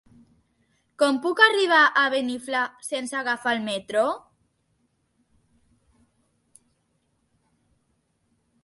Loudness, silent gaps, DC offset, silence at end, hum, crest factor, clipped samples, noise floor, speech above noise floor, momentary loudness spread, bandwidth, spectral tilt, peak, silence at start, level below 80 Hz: -22 LUFS; none; under 0.1%; 4.45 s; none; 24 dB; under 0.1%; -71 dBFS; 49 dB; 11 LU; 12 kHz; -2.5 dB/octave; -4 dBFS; 1 s; -72 dBFS